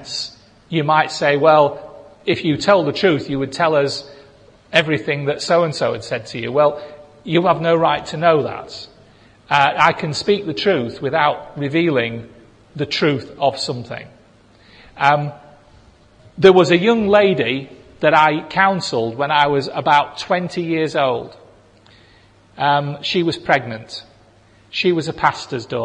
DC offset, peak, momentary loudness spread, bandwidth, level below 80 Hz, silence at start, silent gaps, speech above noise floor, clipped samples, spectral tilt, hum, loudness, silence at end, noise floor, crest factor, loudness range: under 0.1%; 0 dBFS; 14 LU; 10.5 kHz; -56 dBFS; 0 s; none; 33 dB; under 0.1%; -5.5 dB/octave; none; -17 LUFS; 0 s; -50 dBFS; 18 dB; 6 LU